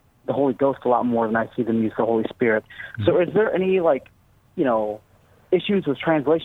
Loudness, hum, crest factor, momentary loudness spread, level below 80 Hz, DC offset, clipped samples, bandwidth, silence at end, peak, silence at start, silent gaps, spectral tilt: -22 LUFS; none; 16 dB; 6 LU; -58 dBFS; under 0.1%; under 0.1%; 4.1 kHz; 0 s; -4 dBFS; 0.3 s; none; -8.5 dB/octave